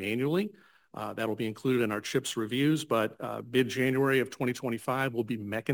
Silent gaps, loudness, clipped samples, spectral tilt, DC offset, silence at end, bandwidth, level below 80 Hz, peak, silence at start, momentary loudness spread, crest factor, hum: none; -30 LUFS; under 0.1%; -5.5 dB/octave; under 0.1%; 0 s; 19 kHz; -72 dBFS; -12 dBFS; 0 s; 7 LU; 16 dB; none